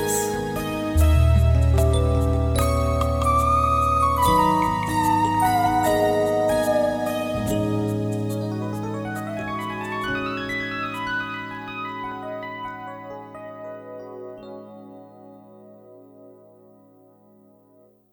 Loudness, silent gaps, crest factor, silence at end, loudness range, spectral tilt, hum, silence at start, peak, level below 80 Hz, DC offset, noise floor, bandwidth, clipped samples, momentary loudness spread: -22 LUFS; none; 16 dB; 1.8 s; 19 LU; -6 dB/octave; none; 0 s; -6 dBFS; -30 dBFS; under 0.1%; -56 dBFS; 17 kHz; under 0.1%; 18 LU